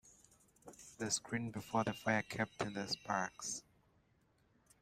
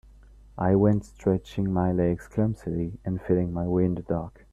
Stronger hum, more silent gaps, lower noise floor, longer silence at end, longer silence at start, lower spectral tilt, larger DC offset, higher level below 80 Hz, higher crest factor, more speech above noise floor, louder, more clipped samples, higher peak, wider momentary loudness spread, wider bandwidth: neither; neither; first, -74 dBFS vs -51 dBFS; first, 1.2 s vs 0.25 s; second, 0.05 s vs 0.55 s; second, -3.5 dB/octave vs -9.5 dB/octave; neither; second, -74 dBFS vs -48 dBFS; about the same, 22 dB vs 18 dB; first, 35 dB vs 25 dB; second, -40 LUFS vs -26 LUFS; neither; second, -20 dBFS vs -8 dBFS; about the same, 10 LU vs 9 LU; first, 15.5 kHz vs 9.6 kHz